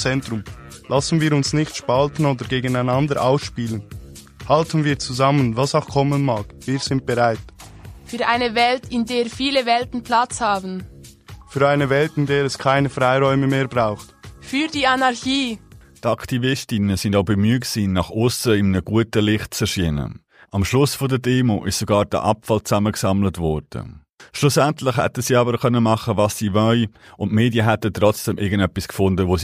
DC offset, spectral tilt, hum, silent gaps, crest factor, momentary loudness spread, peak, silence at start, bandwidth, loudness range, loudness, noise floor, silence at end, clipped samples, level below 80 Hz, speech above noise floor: under 0.1%; -5.5 dB/octave; none; 24.14-24.18 s; 18 dB; 9 LU; -2 dBFS; 0 s; 15.5 kHz; 2 LU; -19 LUFS; -41 dBFS; 0 s; under 0.1%; -44 dBFS; 22 dB